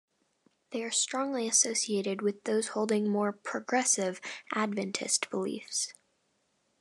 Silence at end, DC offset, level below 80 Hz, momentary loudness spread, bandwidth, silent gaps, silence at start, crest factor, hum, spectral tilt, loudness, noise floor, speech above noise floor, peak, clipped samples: 0.9 s; under 0.1%; -90 dBFS; 9 LU; 12.5 kHz; none; 0.7 s; 20 dB; none; -2.5 dB/octave; -30 LUFS; -75 dBFS; 44 dB; -12 dBFS; under 0.1%